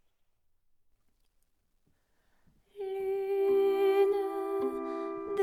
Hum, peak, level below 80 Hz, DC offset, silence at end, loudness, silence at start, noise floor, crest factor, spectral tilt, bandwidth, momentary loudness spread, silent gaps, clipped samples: none; -16 dBFS; -72 dBFS; under 0.1%; 0 s; -30 LUFS; 2.75 s; -72 dBFS; 16 dB; -5.5 dB/octave; 13.5 kHz; 11 LU; none; under 0.1%